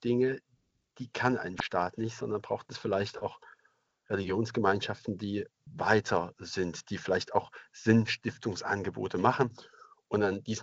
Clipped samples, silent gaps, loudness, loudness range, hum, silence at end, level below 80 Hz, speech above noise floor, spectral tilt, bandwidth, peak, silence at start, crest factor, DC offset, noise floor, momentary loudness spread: under 0.1%; none; -32 LUFS; 4 LU; none; 0 s; -66 dBFS; 40 dB; -5.5 dB/octave; 8 kHz; -10 dBFS; 0 s; 22 dB; under 0.1%; -72 dBFS; 10 LU